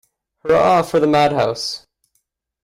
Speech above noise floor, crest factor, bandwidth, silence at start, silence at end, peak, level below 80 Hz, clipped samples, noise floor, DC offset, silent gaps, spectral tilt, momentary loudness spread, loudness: 54 dB; 14 dB; 15.5 kHz; 0.45 s; 0.85 s; -4 dBFS; -52 dBFS; under 0.1%; -69 dBFS; under 0.1%; none; -5 dB/octave; 13 LU; -16 LUFS